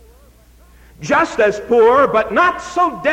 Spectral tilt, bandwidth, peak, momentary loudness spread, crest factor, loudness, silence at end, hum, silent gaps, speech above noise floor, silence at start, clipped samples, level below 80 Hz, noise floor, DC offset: -4.5 dB/octave; 10.5 kHz; -4 dBFS; 7 LU; 12 dB; -14 LUFS; 0 s; none; none; 32 dB; 1 s; under 0.1%; -46 dBFS; -46 dBFS; under 0.1%